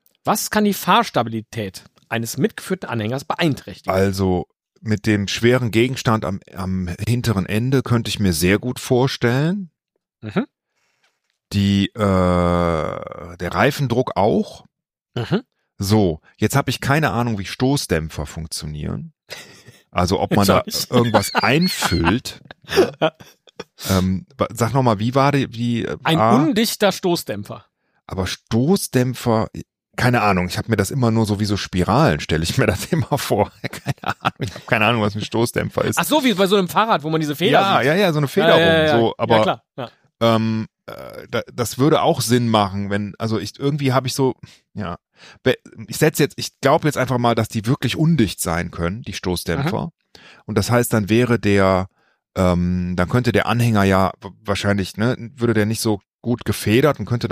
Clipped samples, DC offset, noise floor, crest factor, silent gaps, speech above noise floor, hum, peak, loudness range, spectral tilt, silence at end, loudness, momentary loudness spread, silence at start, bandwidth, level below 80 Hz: under 0.1%; under 0.1%; -69 dBFS; 18 dB; 56.14-56.19 s; 50 dB; none; -2 dBFS; 4 LU; -5.5 dB/octave; 0 s; -19 LUFS; 13 LU; 0.25 s; 15.5 kHz; -44 dBFS